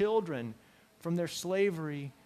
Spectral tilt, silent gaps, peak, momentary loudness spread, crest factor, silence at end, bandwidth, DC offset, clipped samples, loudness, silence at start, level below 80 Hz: -5.5 dB/octave; none; -18 dBFS; 11 LU; 16 dB; 0.15 s; 15.5 kHz; under 0.1%; under 0.1%; -34 LUFS; 0 s; -72 dBFS